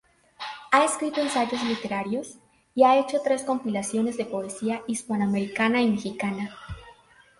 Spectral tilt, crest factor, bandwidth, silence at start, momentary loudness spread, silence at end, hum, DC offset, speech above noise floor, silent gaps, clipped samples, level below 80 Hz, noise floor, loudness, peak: -4.5 dB/octave; 20 dB; 11.5 kHz; 0.4 s; 16 LU; 0.5 s; none; under 0.1%; 30 dB; none; under 0.1%; -58 dBFS; -55 dBFS; -25 LUFS; -6 dBFS